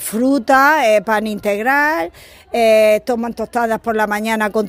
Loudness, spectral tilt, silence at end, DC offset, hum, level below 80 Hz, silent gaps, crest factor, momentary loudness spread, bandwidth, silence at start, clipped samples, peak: -15 LUFS; -4 dB/octave; 0 s; under 0.1%; none; -50 dBFS; none; 16 dB; 10 LU; 16 kHz; 0 s; under 0.1%; 0 dBFS